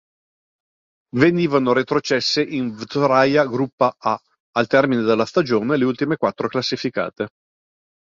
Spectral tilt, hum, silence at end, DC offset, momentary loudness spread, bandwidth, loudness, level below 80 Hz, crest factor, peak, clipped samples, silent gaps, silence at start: -5.5 dB/octave; none; 0.8 s; under 0.1%; 9 LU; 7.6 kHz; -19 LUFS; -60 dBFS; 18 dB; -2 dBFS; under 0.1%; 3.73-3.78 s, 4.40-4.53 s; 1.15 s